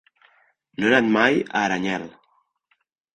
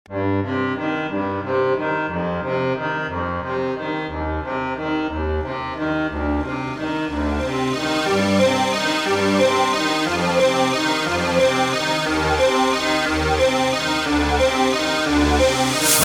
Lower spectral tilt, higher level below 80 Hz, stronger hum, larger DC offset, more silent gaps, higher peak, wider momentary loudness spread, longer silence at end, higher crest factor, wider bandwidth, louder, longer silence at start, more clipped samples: about the same, -5 dB/octave vs -4 dB/octave; second, -62 dBFS vs -36 dBFS; neither; neither; neither; about the same, -4 dBFS vs -2 dBFS; first, 16 LU vs 7 LU; first, 1.05 s vs 0 s; about the same, 20 dB vs 18 dB; second, 9.6 kHz vs over 20 kHz; about the same, -20 LUFS vs -20 LUFS; first, 0.8 s vs 0.1 s; neither